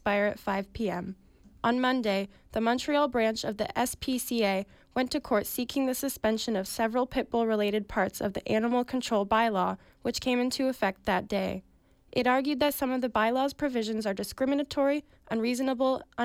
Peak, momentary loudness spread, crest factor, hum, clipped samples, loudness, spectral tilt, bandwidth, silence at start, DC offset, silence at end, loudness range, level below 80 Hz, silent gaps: -14 dBFS; 7 LU; 14 dB; none; under 0.1%; -29 LUFS; -4.5 dB/octave; 16.5 kHz; 0.05 s; under 0.1%; 0 s; 1 LU; -56 dBFS; none